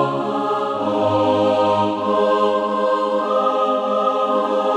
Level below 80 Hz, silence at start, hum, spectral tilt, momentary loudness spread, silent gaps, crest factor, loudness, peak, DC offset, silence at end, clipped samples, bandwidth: -64 dBFS; 0 s; none; -6.5 dB/octave; 4 LU; none; 14 dB; -18 LUFS; -4 dBFS; under 0.1%; 0 s; under 0.1%; 9.4 kHz